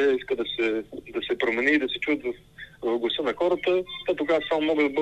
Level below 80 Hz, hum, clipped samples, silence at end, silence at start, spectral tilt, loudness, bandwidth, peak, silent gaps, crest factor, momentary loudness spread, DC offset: -58 dBFS; none; under 0.1%; 0 s; 0 s; -5 dB/octave; -26 LUFS; 8.6 kHz; -10 dBFS; none; 16 dB; 10 LU; under 0.1%